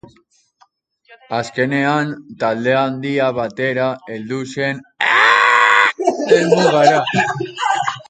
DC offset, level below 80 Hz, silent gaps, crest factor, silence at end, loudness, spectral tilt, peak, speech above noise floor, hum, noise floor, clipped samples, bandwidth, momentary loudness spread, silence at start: under 0.1%; -60 dBFS; none; 16 dB; 0.05 s; -15 LUFS; -4.5 dB/octave; 0 dBFS; 40 dB; none; -57 dBFS; under 0.1%; 9.4 kHz; 12 LU; 1.1 s